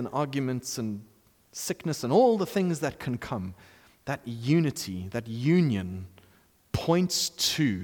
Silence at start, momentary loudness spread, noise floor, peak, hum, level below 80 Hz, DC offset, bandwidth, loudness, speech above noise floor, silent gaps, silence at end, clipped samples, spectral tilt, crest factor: 0 s; 13 LU; -61 dBFS; -12 dBFS; none; -58 dBFS; under 0.1%; 19 kHz; -28 LUFS; 34 dB; none; 0 s; under 0.1%; -5 dB/octave; 18 dB